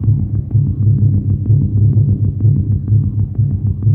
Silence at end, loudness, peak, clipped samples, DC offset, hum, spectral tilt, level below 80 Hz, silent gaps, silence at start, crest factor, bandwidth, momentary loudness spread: 0 s; -14 LUFS; -2 dBFS; under 0.1%; under 0.1%; none; -15.5 dB/octave; -28 dBFS; none; 0 s; 10 dB; 1.1 kHz; 4 LU